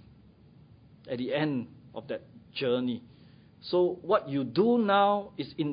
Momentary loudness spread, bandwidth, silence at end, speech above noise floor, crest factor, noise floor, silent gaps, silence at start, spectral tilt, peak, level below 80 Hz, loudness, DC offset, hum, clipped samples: 16 LU; 5.2 kHz; 0 s; 28 dB; 20 dB; -56 dBFS; none; 1.05 s; -10 dB/octave; -10 dBFS; -66 dBFS; -29 LUFS; under 0.1%; none; under 0.1%